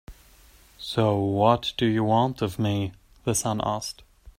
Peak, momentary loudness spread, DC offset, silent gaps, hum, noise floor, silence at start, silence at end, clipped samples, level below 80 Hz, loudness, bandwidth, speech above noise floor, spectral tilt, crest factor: -4 dBFS; 12 LU; under 0.1%; none; none; -54 dBFS; 0.1 s; 0.1 s; under 0.1%; -52 dBFS; -25 LUFS; 16 kHz; 30 dB; -5.5 dB/octave; 22 dB